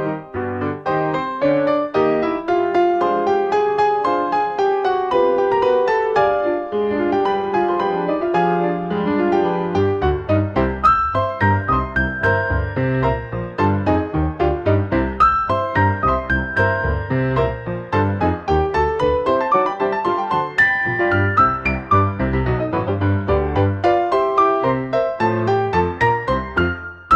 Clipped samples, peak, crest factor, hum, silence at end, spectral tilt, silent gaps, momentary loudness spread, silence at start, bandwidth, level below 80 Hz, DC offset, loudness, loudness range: under 0.1%; -4 dBFS; 14 dB; none; 0 s; -8 dB/octave; none; 5 LU; 0 s; 7.6 kHz; -34 dBFS; under 0.1%; -18 LUFS; 2 LU